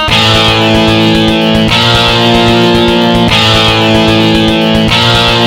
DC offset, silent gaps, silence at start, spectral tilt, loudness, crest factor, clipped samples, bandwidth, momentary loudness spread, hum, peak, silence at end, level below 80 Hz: 0.6%; none; 0 s; -5 dB/octave; -6 LUFS; 8 dB; 1%; 16.5 kHz; 2 LU; none; 0 dBFS; 0 s; -24 dBFS